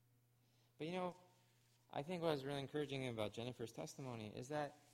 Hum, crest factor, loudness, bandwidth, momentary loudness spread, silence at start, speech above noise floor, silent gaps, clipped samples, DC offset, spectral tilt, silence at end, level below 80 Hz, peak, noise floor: none; 24 dB; -47 LUFS; 16 kHz; 9 LU; 0.8 s; 30 dB; none; under 0.1%; under 0.1%; -5.5 dB/octave; 0.15 s; -80 dBFS; -24 dBFS; -76 dBFS